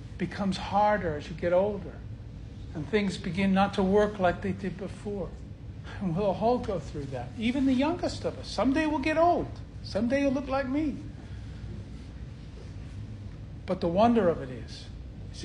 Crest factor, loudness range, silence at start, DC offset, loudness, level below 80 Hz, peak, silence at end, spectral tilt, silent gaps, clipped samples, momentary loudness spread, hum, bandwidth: 20 dB; 5 LU; 0 s; under 0.1%; -28 LUFS; -46 dBFS; -10 dBFS; 0 s; -7 dB/octave; none; under 0.1%; 18 LU; none; 10.5 kHz